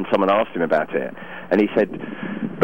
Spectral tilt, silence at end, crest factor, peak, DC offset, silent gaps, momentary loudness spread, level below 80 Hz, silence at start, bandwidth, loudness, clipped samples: -8 dB/octave; 0 s; 16 dB; -6 dBFS; 0.8%; none; 12 LU; -58 dBFS; 0 s; 16 kHz; -21 LUFS; under 0.1%